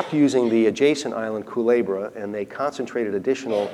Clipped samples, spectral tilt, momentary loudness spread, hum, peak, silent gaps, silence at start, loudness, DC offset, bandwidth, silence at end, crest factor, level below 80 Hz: under 0.1%; -5.5 dB/octave; 9 LU; none; -6 dBFS; none; 0 s; -22 LUFS; under 0.1%; 12 kHz; 0 s; 16 dB; -68 dBFS